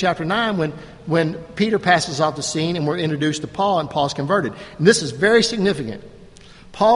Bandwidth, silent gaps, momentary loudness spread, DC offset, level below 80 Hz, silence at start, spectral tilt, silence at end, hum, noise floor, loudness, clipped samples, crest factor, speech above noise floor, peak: 11.5 kHz; none; 9 LU; under 0.1%; -50 dBFS; 0 s; -4.5 dB/octave; 0 s; none; -43 dBFS; -19 LUFS; under 0.1%; 20 dB; 24 dB; 0 dBFS